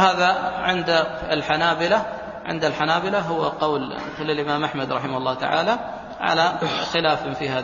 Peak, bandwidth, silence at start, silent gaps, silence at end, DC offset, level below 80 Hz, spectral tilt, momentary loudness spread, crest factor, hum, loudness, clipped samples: -4 dBFS; 7.4 kHz; 0 s; none; 0 s; under 0.1%; -52 dBFS; -4.5 dB/octave; 7 LU; 20 dB; none; -22 LUFS; under 0.1%